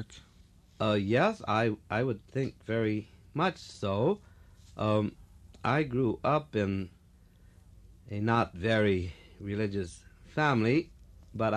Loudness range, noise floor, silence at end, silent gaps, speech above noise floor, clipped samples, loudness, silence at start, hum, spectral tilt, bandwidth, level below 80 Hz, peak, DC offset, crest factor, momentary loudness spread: 2 LU; -59 dBFS; 0 s; none; 29 dB; under 0.1%; -31 LUFS; 0 s; none; -7 dB/octave; 10.5 kHz; -56 dBFS; -12 dBFS; under 0.1%; 18 dB; 13 LU